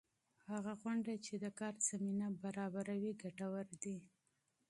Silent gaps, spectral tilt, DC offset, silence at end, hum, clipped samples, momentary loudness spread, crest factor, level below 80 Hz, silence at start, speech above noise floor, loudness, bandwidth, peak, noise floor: none; -5 dB/octave; under 0.1%; 0.65 s; none; under 0.1%; 8 LU; 18 dB; -86 dBFS; 0.45 s; 40 dB; -44 LUFS; 11.5 kHz; -26 dBFS; -83 dBFS